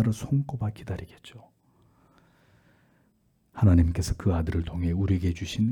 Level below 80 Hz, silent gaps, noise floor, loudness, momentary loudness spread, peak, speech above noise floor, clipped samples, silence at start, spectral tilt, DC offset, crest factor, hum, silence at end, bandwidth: -42 dBFS; none; -67 dBFS; -27 LUFS; 21 LU; -10 dBFS; 42 dB; under 0.1%; 0 s; -7.5 dB/octave; under 0.1%; 18 dB; none; 0 s; 16.5 kHz